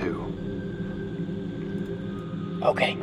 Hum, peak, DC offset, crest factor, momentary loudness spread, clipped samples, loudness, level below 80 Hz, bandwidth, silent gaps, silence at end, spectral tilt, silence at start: none; -8 dBFS; under 0.1%; 22 dB; 9 LU; under 0.1%; -30 LUFS; -50 dBFS; 11.5 kHz; none; 0 s; -7 dB/octave; 0 s